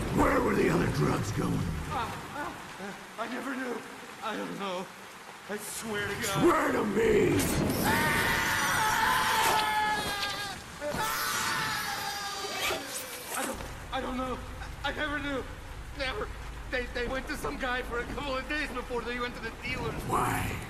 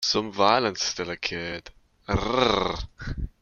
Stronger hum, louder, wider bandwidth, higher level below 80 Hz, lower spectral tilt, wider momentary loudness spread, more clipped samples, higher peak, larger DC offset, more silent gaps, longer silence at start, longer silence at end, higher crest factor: neither; second, -30 LUFS vs -25 LUFS; about the same, 14.5 kHz vs 13.5 kHz; second, -46 dBFS vs -40 dBFS; about the same, -4 dB/octave vs -3.5 dB/octave; about the same, 13 LU vs 14 LU; neither; second, -14 dBFS vs -4 dBFS; neither; neither; about the same, 0 s vs 0 s; about the same, 0 s vs 0.1 s; second, 16 dB vs 22 dB